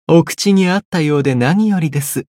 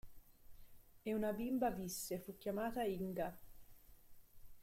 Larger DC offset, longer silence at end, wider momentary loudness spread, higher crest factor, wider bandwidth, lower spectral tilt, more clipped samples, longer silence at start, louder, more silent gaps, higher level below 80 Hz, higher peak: neither; first, 0.15 s vs 0 s; second, 4 LU vs 7 LU; second, 12 dB vs 18 dB; about the same, 16.5 kHz vs 16.5 kHz; about the same, -6 dB/octave vs -5 dB/octave; neither; about the same, 0.1 s vs 0.05 s; first, -14 LUFS vs -42 LUFS; first, 0.85-0.92 s vs none; first, -56 dBFS vs -64 dBFS; first, -2 dBFS vs -26 dBFS